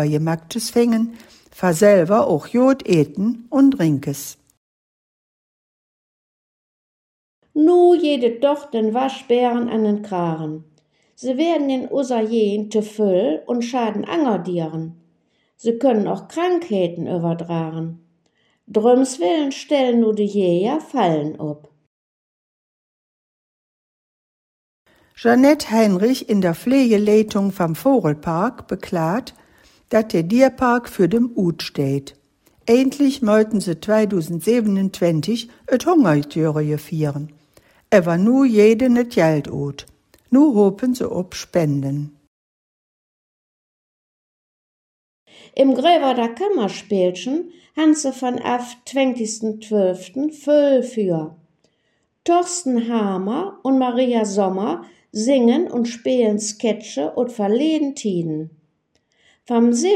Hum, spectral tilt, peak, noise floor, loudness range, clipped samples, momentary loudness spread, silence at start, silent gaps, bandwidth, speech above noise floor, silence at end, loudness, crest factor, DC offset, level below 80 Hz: none; -6 dB/octave; 0 dBFS; -67 dBFS; 5 LU; under 0.1%; 11 LU; 0 s; 4.57-7.42 s, 21.87-24.85 s, 42.27-45.26 s; 16 kHz; 50 dB; 0 s; -19 LUFS; 18 dB; under 0.1%; -60 dBFS